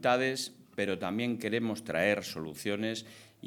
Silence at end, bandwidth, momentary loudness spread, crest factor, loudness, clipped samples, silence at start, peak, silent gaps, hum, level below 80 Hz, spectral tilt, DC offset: 0 s; 19 kHz; 10 LU; 20 dB; -33 LUFS; under 0.1%; 0 s; -12 dBFS; none; none; -74 dBFS; -4.5 dB/octave; under 0.1%